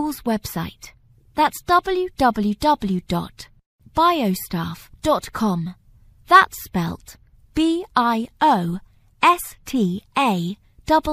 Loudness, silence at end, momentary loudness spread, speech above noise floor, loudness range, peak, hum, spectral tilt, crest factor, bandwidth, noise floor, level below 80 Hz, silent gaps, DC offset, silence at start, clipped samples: -20 LUFS; 0 s; 12 LU; 30 dB; 3 LU; 0 dBFS; none; -5 dB/octave; 20 dB; 15.5 kHz; -50 dBFS; -46 dBFS; 3.66-3.79 s; under 0.1%; 0 s; under 0.1%